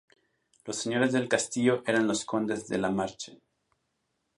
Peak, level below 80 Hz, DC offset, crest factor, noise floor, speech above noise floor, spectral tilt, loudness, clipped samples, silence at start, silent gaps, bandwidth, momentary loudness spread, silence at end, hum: -10 dBFS; -68 dBFS; under 0.1%; 22 dB; -79 dBFS; 50 dB; -4 dB/octave; -28 LUFS; under 0.1%; 0.65 s; none; 11.5 kHz; 12 LU; 1.05 s; none